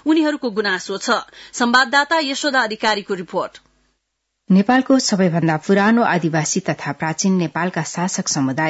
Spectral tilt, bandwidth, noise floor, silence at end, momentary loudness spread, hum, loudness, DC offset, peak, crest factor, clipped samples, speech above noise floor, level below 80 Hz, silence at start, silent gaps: -4.5 dB/octave; 8 kHz; -75 dBFS; 0 s; 8 LU; none; -18 LUFS; under 0.1%; -4 dBFS; 14 dB; under 0.1%; 57 dB; -62 dBFS; 0.05 s; none